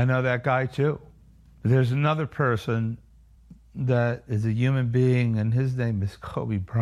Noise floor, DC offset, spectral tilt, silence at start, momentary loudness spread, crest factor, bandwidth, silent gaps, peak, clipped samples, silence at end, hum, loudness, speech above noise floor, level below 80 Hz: -53 dBFS; under 0.1%; -8.5 dB/octave; 0 s; 9 LU; 16 dB; 7 kHz; none; -8 dBFS; under 0.1%; 0 s; none; -25 LUFS; 29 dB; -52 dBFS